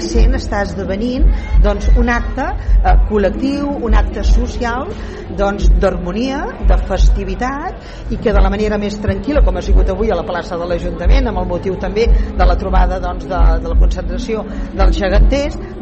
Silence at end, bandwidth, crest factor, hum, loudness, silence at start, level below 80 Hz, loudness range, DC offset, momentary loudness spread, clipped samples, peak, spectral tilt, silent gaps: 0 s; 7.4 kHz; 12 dB; none; -16 LUFS; 0 s; -14 dBFS; 2 LU; under 0.1%; 7 LU; under 0.1%; -2 dBFS; -7 dB/octave; none